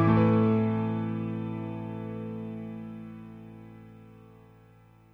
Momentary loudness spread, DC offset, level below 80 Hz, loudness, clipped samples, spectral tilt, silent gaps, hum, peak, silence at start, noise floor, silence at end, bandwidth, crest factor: 25 LU; under 0.1%; -58 dBFS; -29 LUFS; under 0.1%; -10.5 dB/octave; none; none; -10 dBFS; 0 s; -56 dBFS; 0.8 s; 4.6 kHz; 20 dB